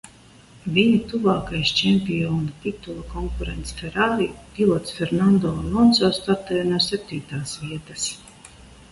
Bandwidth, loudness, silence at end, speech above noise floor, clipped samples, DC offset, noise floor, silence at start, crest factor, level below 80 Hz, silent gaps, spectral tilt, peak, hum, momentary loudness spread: 11.5 kHz; -22 LUFS; 0.15 s; 27 dB; under 0.1%; under 0.1%; -49 dBFS; 0.05 s; 18 dB; -40 dBFS; none; -5 dB/octave; -4 dBFS; none; 13 LU